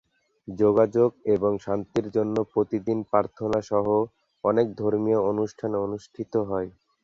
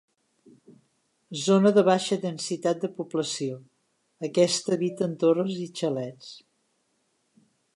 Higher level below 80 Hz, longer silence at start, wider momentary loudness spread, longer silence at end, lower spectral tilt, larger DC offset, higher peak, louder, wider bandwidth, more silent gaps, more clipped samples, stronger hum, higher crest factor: first, -58 dBFS vs -78 dBFS; second, 0.5 s vs 0.7 s; second, 8 LU vs 17 LU; second, 0.35 s vs 1.35 s; first, -8.5 dB/octave vs -5 dB/octave; neither; about the same, -6 dBFS vs -8 dBFS; about the same, -25 LUFS vs -25 LUFS; second, 7.4 kHz vs 11.5 kHz; neither; neither; neither; about the same, 18 dB vs 20 dB